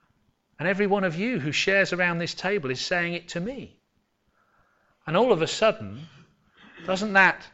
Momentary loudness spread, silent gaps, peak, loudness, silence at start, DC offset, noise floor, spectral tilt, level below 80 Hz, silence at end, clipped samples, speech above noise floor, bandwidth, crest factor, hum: 16 LU; none; -6 dBFS; -24 LUFS; 0.6 s; under 0.1%; -71 dBFS; -4.5 dB/octave; -60 dBFS; 0.05 s; under 0.1%; 47 dB; 8.2 kHz; 20 dB; none